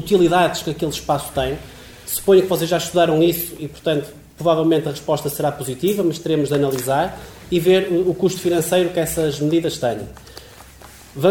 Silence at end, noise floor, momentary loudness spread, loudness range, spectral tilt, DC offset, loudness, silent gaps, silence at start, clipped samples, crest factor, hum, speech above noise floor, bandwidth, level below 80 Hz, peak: 0 s; -42 dBFS; 14 LU; 2 LU; -5 dB/octave; under 0.1%; -19 LUFS; none; 0 s; under 0.1%; 16 dB; none; 24 dB; 19 kHz; -46 dBFS; -2 dBFS